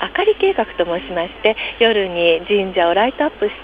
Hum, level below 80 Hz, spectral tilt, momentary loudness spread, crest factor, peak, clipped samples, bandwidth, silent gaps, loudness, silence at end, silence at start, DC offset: none; -46 dBFS; -6.5 dB/octave; 5 LU; 16 dB; 0 dBFS; under 0.1%; 4.9 kHz; none; -17 LUFS; 0 s; 0 s; under 0.1%